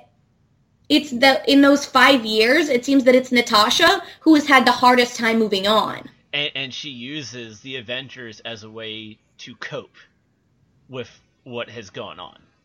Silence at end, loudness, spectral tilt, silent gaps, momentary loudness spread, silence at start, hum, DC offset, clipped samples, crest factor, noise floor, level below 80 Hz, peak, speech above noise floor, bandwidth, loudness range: 0.35 s; -16 LUFS; -3 dB/octave; none; 21 LU; 0.9 s; none; under 0.1%; under 0.1%; 20 dB; -64 dBFS; -58 dBFS; 0 dBFS; 45 dB; 16.5 kHz; 20 LU